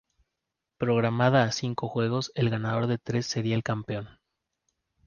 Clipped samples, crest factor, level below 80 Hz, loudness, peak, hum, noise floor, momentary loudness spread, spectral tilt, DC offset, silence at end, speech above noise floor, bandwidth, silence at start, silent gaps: under 0.1%; 18 dB; -62 dBFS; -27 LUFS; -10 dBFS; none; -85 dBFS; 10 LU; -6 dB/octave; under 0.1%; 1 s; 58 dB; 7.2 kHz; 0.8 s; none